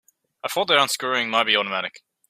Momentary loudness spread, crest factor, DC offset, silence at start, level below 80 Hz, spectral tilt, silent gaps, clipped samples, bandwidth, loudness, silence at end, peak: 11 LU; 22 dB; under 0.1%; 0.45 s; -72 dBFS; -1.5 dB/octave; none; under 0.1%; 15.5 kHz; -21 LUFS; 0.3 s; -2 dBFS